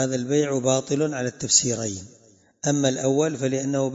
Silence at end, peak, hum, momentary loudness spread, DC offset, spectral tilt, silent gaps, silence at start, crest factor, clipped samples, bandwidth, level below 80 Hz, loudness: 0 s; -4 dBFS; none; 10 LU; under 0.1%; -4 dB/octave; none; 0 s; 18 dB; under 0.1%; 8 kHz; -64 dBFS; -23 LUFS